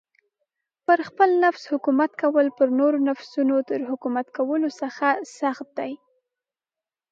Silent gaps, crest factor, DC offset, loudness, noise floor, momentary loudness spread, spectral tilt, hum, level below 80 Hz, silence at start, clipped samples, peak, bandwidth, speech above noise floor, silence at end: none; 18 dB; under 0.1%; -23 LUFS; under -90 dBFS; 10 LU; -5 dB/octave; none; -82 dBFS; 0.9 s; under 0.1%; -4 dBFS; 7.6 kHz; over 68 dB; 1.15 s